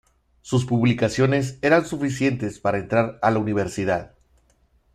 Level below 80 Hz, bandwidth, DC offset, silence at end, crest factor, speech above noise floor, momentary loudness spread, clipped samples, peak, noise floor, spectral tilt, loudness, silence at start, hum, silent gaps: -52 dBFS; 12 kHz; under 0.1%; 0.85 s; 18 dB; 40 dB; 6 LU; under 0.1%; -4 dBFS; -61 dBFS; -6.5 dB/octave; -22 LUFS; 0.45 s; none; none